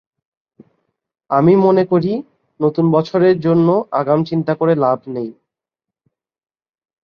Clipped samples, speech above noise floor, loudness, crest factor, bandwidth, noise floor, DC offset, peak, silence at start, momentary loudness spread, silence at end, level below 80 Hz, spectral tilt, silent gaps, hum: under 0.1%; 71 dB; -15 LUFS; 16 dB; 6.4 kHz; -85 dBFS; under 0.1%; -2 dBFS; 1.3 s; 10 LU; 1.7 s; -60 dBFS; -10 dB/octave; none; none